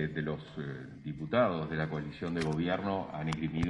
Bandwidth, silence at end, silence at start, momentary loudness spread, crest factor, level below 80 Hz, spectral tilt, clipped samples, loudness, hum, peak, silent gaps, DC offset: 11 kHz; 0 s; 0 s; 12 LU; 18 dB; -56 dBFS; -7 dB/octave; under 0.1%; -34 LUFS; none; -16 dBFS; none; under 0.1%